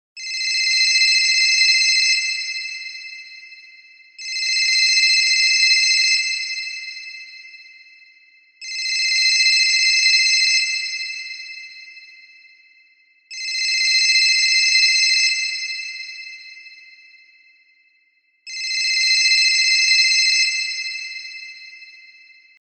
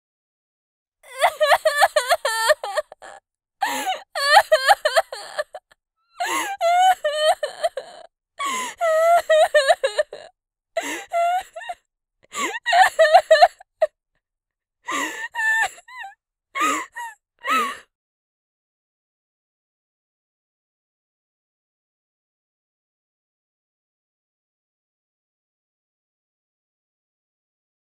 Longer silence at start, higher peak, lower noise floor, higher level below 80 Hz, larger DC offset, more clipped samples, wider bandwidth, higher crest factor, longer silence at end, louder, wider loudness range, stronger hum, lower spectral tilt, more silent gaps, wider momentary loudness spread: second, 0.15 s vs 1.1 s; second, -4 dBFS vs 0 dBFS; second, -62 dBFS vs -86 dBFS; second, under -90 dBFS vs -68 dBFS; neither; neither; second, 14 kHz vs 16 kHz; second, 16 dB vs 22 dB; second, 0.65 s vs 10.15 s; first, -15 LUFS vs -20 LUFS; about the same, 7 LU vs 8 LU; neither; second, 9 dB/octave vs 0.5 dB/octave; neither; about the same, 20 LU vs 19 LU